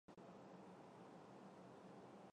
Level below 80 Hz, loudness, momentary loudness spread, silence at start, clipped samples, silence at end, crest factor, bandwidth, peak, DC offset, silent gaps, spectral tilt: under -90 dBFS; -62 LUFS; 1 LU; 0.1 s; under 0.1%; 0 s; 12 dB; 10 kHz; -50 dBFS; under 0.1%; none; -6.5 dB/octave